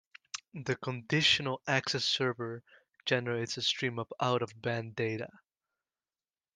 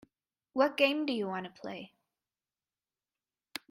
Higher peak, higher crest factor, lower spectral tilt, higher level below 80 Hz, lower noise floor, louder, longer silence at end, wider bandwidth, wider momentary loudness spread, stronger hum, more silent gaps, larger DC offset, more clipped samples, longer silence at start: about the same, -12 dBFS vs -12 dBFS; about the same, 24 dB vs 24 dB; about the same, -4 dB/octave vs -4.5 dB/octave; first, -72 dBFS vs -82 dBFS; about the same, under -90 dBFS vs under -90 dBFS; about the same, -32 LUFS vs -31 LUFS; second, 1.3 s vs 1.85 s; second, 10 kHz vs 16 kHz; second, 14 LU vs 18 LU; neither; neither; neither; neither; second, 0.35 s vs 0.55 s